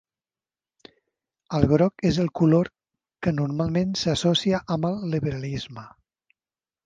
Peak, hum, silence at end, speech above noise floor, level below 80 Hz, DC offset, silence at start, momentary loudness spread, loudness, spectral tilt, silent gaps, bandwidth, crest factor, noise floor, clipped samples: -2 dBFS; none; 0.95 s; over 67 dB; -48 dBFS; under 0.1%; 1.5 s; 11 LU; -24 LUFS; -6.5 dB/octave; none; 9.2 kHz; 24 dB; under -90 dBFS; under 0.1%